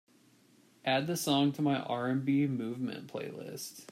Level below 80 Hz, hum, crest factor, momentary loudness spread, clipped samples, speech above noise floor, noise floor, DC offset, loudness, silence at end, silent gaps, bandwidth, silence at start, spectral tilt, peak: -78 dBFS; none; 16 dB; 13 LU; under 0.1%; 32 dB; -64 dBFS; under 0.1%; -33 LUFS; 0.05 s; none; 16 kHz; 0.85 s; -5 dB/octave; -18 dBFS